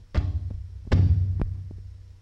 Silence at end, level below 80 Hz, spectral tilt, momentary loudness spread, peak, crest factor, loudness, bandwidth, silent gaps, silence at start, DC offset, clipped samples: 0.1 s; -30 dBFS; -9 dB/octave; 19 LU; -10 dBFS; 16 dB; -26 LUFS; 6 kHz; none; 0 s; under 0.1%; under 0.1%